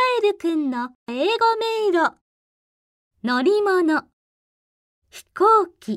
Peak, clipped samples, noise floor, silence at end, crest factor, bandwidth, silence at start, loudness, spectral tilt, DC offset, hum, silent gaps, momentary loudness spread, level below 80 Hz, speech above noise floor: -6 dBFS; under 0.1%; under -90 dBFS; 0 s; 16 dB; 14 kHz; 0 s; -20 LUFS; -4.5 dB/octave; under 0.1%; none; 0.95-1.06 s, 2.21-3.11 s, 4.13-5.02 s; 10 LU; -72 dBFS; over 70 dB